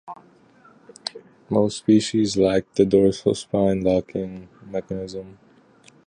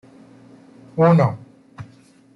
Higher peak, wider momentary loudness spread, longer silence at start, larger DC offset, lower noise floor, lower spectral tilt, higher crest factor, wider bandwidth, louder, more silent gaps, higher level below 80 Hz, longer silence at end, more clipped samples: about the same, -4 dBFS vs -4 dBFS; second, 16 LU vs 26 LU; second, 0.05 s vs 0.95 s; neither; about the same, -53 dBFS vs -50 dBFS; second, -6 dB/octave vs -9.5 dB/octave; about the same, 20 dB vs 18 dB; first, 10.5 kHz vs 6 kHz; second, -21 LUFS vs -17 LUFS; neither; first, -50 dBFS vs -60 dBFS; first, 0.75 s vs 0.5 s; neither